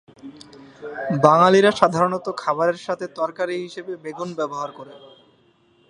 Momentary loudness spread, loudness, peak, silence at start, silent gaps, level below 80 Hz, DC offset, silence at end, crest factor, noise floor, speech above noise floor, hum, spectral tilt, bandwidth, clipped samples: 20 LU; -20 LUFS; 0 dBFS; 0.25 s; none; -66 dBFS; under 0.1%; 0.95 s; 22 dB; -59 dBFS; 38 dB; none; -5.5 dB/octave; 10.5 kHz; under 0.1%